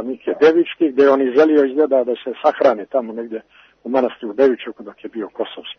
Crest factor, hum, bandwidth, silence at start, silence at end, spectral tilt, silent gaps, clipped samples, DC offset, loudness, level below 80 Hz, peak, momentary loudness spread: 16 dB; none; 6.4 kHz; 0 s; 0.05 s; -6 dB/octave; none; under 0.1%; under 0.1%; -17 LUFS; -68 dBFS; -2 dBFS; 16 LU